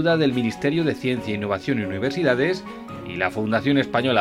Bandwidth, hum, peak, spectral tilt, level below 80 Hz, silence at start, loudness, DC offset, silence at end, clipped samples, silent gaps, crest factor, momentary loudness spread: 13 kHz; none; -4 dBFS; -6.5 dB/octave; -54 dBFS; 0 s; -23 LUFS; under 0.1%; 0 s; under 0.1%; none; 18 dB; 6 LU